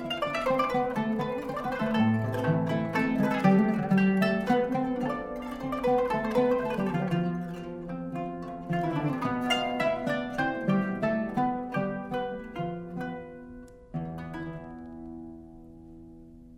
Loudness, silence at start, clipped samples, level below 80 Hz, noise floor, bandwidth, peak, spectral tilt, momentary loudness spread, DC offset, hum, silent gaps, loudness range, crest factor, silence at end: -29 LUFS; 0 s; under 0.1%; -54 dBFS; -49 dBFS; 15.5 kHz; -10 dBFS; -7 dB/octave; 17 LU; under 0.1%; none; none; 12 LU; 20 dB; 0 s